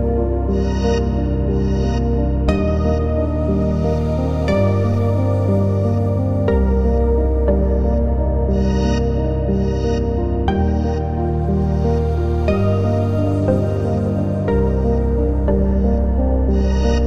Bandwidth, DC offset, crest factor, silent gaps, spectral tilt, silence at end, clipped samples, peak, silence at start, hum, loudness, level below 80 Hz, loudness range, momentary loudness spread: 6.6 kHz; 1%; 14 dB; none; -9 dB/octave; 0 s; under 0.1%; -2 dBFS; 0 s; none; -18 LUFS; -20 dBFS; 1 LU; 2 LU